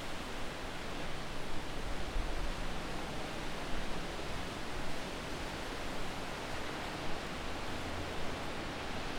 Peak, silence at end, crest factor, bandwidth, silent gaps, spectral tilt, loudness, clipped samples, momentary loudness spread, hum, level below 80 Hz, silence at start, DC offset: -22 dBFS; 0 s; 16 dB; 15.5 kHz; none; -4 dB/octave; -41 LUFS; under 0.1%; 2 LU; none; -44 dBFS; 0 s; under 0.1%